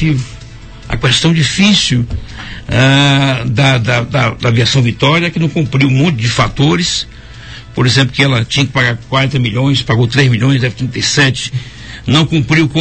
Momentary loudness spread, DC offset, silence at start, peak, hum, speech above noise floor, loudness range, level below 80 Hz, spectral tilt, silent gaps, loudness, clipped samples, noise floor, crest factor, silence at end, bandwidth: 12 LU; 0.6%; 0 s; 0 dBFS; none; 20 dB; 2 LU; -32 dBFS; -5 dB/octave; none; -11 LUFS; under 0.1%; -31 dBFS; 12 dB; 0 s; 9 kHz